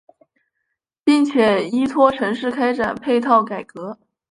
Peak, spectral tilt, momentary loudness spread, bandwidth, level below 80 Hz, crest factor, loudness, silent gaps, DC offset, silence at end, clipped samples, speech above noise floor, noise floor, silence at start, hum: -2 dBFS; -5.5 dB/octave; 13 LU; 11 kHz; -58 dBFS; 18 dB; -18 LUFS; none; under 0.1%; 0.4 s; under 0.1%; 59 dB; -76 dBFS; 1.05 s; none